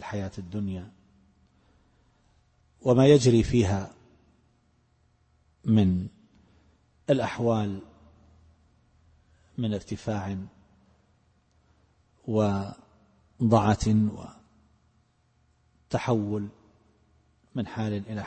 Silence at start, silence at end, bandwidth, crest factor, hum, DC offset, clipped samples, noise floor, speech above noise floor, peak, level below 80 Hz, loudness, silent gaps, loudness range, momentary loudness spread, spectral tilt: 0 s; 0 s; 8.8 kHz; 22 dB; none; under 0.1%; under 0.1%; -67 dBFS; 42 dB; -6 dBFS; -50 dBFS; -26 LUFS; none; 11 LU; 19 LU; -7 dB/octave